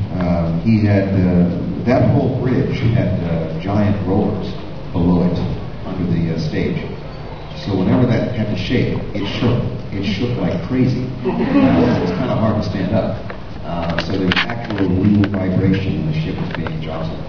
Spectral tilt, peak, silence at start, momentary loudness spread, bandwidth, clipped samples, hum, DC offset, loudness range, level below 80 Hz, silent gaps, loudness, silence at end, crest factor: -8.5 dB/octave; 0 dBFS; 0 s; 10 LU; 5.4 kHz; under 0.1%; none; 2%; 3 LU; -34 dBFS; none; -18 LUFS; 0 s; 18 dB